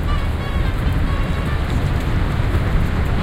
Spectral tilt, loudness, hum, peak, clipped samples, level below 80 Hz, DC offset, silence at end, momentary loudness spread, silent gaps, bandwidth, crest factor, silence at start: -7 dB/octave; -21 LUFS; none; -6 dBFS; under 0.1%; -20 dBFS; under 0.1%; 0 s; 2 LU; none; 15.5 kHz; 12 dB; 0 s